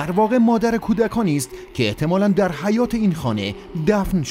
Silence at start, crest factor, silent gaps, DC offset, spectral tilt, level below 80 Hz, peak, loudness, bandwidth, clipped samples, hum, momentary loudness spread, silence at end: 0 s; 16 dB; none; under 0.1%; -6.5 dB/octave; -40 dBFS; -4 dBFS; -20 LUFS; 16 kHz; under 0.1%; none; 8 LU; 0 s